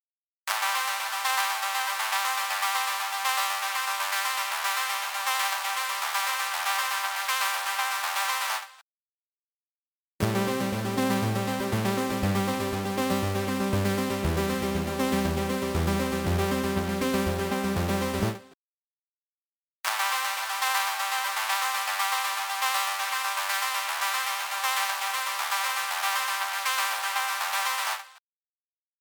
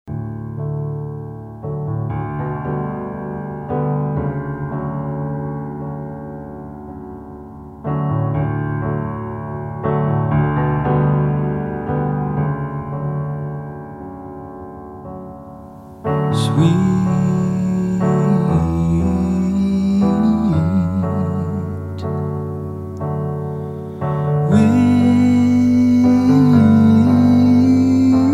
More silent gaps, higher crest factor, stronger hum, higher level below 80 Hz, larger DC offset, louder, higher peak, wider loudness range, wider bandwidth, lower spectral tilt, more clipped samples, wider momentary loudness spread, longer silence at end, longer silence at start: first, 8.82-10.19 s, 18.54-19.84 s vs none; first, 22 dB vs 16 dB; neither; second, -48 dBFS vs -40 dBFS; neither; second, -27 LUFS vs -18 LUFS; second, -8 dBFS vs -2 dBFS; second, 3 LU vs 12 LU; first, over 20 kHz vs 10.5 kHz; second, -3 dB/octave vs -9 dB/octave; neither; second, 3 LU vs 20 LU; first, 0.8 s vs 0 s; first, 0.45 s vs 0.05 s